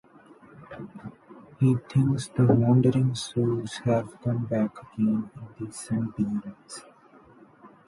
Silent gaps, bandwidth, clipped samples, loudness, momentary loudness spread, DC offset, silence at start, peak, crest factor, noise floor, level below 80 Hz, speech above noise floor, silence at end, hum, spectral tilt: none; 11.5 kHz; under 0.1%; -26 LUFS; 21 LU; under 0.1%; 0.6 s; -8 dBFS; 18 dB; -54 dBFS; -58 dBFS; 29 dB; 0.2 s; none; -7.5 dB/octave